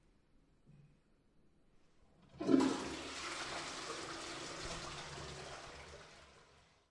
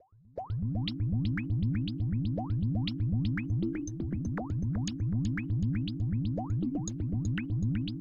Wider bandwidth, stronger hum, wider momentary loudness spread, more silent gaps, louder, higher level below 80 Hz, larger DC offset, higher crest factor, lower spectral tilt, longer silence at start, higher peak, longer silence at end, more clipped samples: first, 11.5 kHz vs 7.4 kHz; neither; first, 21 LU vs 4 LU; neither; second, -41 LUFS vs -32 LUFS; second, -66 dBFS vs -46 dBFS; second, under 0.1% vs 0.2%; first, 28 dB vs 12 dB; second, -4 dB/octave vs -7 dB/octave; first, 0.7 s vs 0 s; first, -16 dBFS vs -20 dBFS; first, 0.3 s vs 0 s; neither